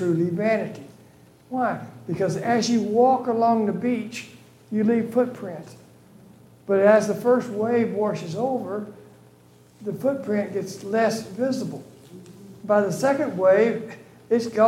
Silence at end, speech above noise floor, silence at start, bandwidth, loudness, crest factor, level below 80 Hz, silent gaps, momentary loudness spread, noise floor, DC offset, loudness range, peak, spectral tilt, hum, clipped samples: 0 s; 31 dB; 0 s; 16 kHz; -23 LUFS; 18 dB; -70 dBFS; none; 17 LU; -53 dBFS; under 0.1%; 5 LU; -6 dBFS; -6 dB/octave; 60 Hz at -50 dBFS; under 0.1%